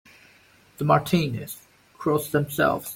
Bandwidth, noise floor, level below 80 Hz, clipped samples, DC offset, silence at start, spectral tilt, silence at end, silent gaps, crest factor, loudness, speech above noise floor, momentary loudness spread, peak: 17 kHz; -56 dBFS; -56 dBFS; under 0.1%; under 0.1%; 0.8 s; -6 dB/octave; 0 s; none; 20 dB; -24 LUFS; 33 dB; 14 LU; -6 dBFS